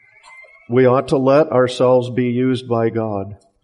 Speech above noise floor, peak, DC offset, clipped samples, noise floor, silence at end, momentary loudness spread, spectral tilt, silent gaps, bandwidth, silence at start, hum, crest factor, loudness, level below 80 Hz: 28 dB; -4 dBFS; under 0.1%; under 0.1%; -44 dBFS; 0.3 s; 9 LU; -7.5 dB/octave; none; 11 kHz; 0.4 s; none; 14 dB; -16 LUFS; -56 dBFS